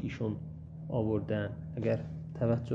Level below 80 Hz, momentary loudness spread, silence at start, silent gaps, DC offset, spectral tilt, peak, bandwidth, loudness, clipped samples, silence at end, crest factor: -54 dBFS; 10 LU; 0 s; none; under 0.1%; -9.5 dB/octave; -16 dBFS; 7.2 kHz; -35 LUFS; under 0.1%; 0 s; 18 dB